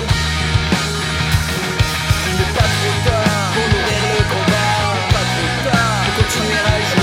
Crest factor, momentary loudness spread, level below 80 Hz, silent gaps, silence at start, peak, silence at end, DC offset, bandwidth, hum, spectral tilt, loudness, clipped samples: 14 dB; 2 LU; -28 dBFS; none; 0 s; -2 dBFS; 0 s; under 0.1%; 16.5 kHz; none; -4 dB/octave; -16 LUFS; under 0.1%